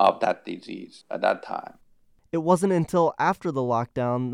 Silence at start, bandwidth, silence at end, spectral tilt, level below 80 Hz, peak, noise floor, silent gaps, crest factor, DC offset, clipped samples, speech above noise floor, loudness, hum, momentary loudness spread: 0 s; 15.5 kHz; 0 s; -6.5 dB/octave; -62 dBFS; -6 dBFS; -59 dBFS; none; 20 dB; under 0.1%; under 0.1%; 35 dB; -25 LUFS; none; 15 LU